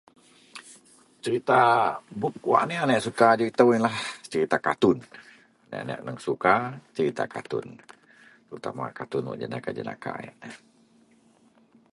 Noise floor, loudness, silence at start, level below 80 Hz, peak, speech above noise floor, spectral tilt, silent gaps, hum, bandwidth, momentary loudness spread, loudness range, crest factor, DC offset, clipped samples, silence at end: -60 dBFS; -25 LUFS; 0.55 s; -68 dBFS; -4 dBFS; 35 dB; -5.5 dB/octave; none; none; 11.5 kHz; 19 LU; 13 LU; 24 dB; under 0.1%; under 0.1%; 1.4 s